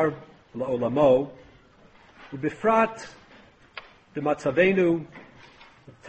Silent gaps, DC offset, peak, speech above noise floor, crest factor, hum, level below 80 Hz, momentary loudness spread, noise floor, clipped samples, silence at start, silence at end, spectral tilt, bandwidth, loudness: none; under 0.1%; -8 dBFS; 31 dB; 20 dB; none; -60 dBFS; 23 LU; -55 dBFS; under 0.1%; 0 s; 0 s; -7 dB/octave; 8.4 kHz; -24 LUFS